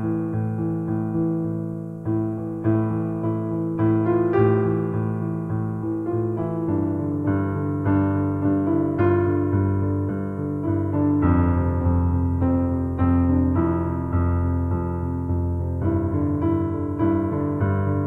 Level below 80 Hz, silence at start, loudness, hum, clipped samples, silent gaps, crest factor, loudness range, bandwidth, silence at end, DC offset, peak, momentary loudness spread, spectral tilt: -38 dBFS; 0 s; -23 LUFS; none; under 0.1%; none; 16 dB; 3 LU; 3.2 kHz; 0 s; under 0.1%; -6 dBFS; 7 LU; -11.5 dB/octave